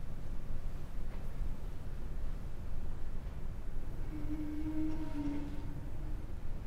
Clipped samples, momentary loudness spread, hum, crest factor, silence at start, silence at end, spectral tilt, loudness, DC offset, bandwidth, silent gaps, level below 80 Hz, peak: under 0.1%; 7 LU; none; 10 dB; 0 s; 0 s; -8 dB/octave; -44 LUFS; under 0.1%; 4.7 kHz; none; -40 dBFS; -24 dBFS